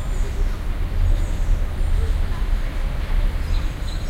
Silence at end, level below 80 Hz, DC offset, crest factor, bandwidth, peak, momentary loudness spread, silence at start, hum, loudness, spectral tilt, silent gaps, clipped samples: 0 s; -20 dBFS; under 0.1%; 12 dB; 9.4 kHz; -8 dBFS; 4 LU; 0 s; none; -26 LUFS; -6 dB/octave; none; under 0.1%